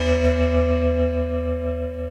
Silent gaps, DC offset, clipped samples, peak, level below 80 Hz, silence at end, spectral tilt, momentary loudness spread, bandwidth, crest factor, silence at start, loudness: none; under 0.1%; under 0.1%; -8 dBFS; -26 dBFS; 0 s; -7.5 dB/octave; 7 LU; 8.2 kHz; 14 dB; 0 s; -22 LUFS